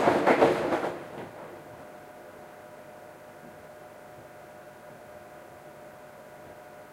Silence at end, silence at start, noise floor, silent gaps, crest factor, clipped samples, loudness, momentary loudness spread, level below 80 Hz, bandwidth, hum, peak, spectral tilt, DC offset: 0.05 s; 0 s; -48 dBFS; none; 26 dB; under 0.1%; -26 LUFS; 24 LU; -66 dBFS; 16 kHz; 50 Hz at -65 dBFS; -6 dBFS; -5.5 dB/octave; under 0.1%